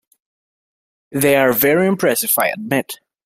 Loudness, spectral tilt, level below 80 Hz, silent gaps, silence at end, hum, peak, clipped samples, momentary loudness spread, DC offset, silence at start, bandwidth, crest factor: -16 LUFS; -4 dB/octave; -58 dBFS; none; 0.3 s; none; -2 dBFS; under 0.1%; 8 LU; under 0.1%; 1.1 s; 16 kHz; 18 dB